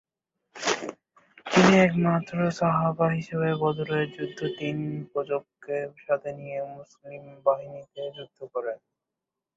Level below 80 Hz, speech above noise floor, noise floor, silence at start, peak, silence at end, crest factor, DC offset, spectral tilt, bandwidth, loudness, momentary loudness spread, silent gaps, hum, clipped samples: -64 dBFS; 60 dB; -87 dBFS; 0.55 s; -6 dBFS; 0.8 s; 20 dB; under 0.1%; -6 dB/octave; 7.8 kHz; -26 LUFS; 19 LU; none; none; under 0.1%